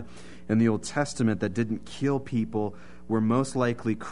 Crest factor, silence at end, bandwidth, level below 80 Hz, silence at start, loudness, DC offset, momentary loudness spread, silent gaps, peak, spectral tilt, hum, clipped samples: 16 dB; 0 s; 11 kHz; -56 dBFS; 0 s; -27 LUFS; 0.8%; 7 LU; none; -12 dBFS; -6.5 dB/octave; none; under 0.1%